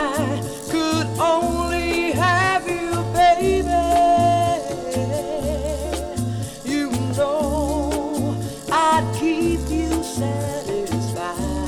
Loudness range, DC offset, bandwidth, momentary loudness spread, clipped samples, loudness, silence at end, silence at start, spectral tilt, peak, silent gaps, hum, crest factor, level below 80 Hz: 5 LU; under 0.1%; 17.5 kHz; 9 LU; under 0.1%; -21 LUFS; 0 s; 0 s; -5.5 dB/octave; -6 dBFS; none; none; 16 dB; -34 dBFS